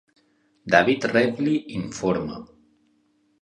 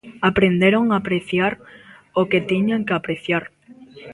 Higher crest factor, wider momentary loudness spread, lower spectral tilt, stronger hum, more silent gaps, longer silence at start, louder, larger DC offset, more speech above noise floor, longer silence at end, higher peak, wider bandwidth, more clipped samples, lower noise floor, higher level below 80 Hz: first, 24 dB vs 18 dB; first, 16 LU vs 8 LU; second, -5.5 dB/octave vs -7.5 dB/octave; neither; neither; first, 0.65 s vs 0.05 s; second, -22 LUFS vs -19 LUFS; neither; first, 43 dB vs 25 dB; first, 0.95 s vs 0 s; about the same, 0 dBFS vs -2 dBFS; about the same, 11 kHz vs 11.5 kHz; neither; first, -65 dBFS vs -44 dBFS; second, -56 dBFS vs -50 dBFS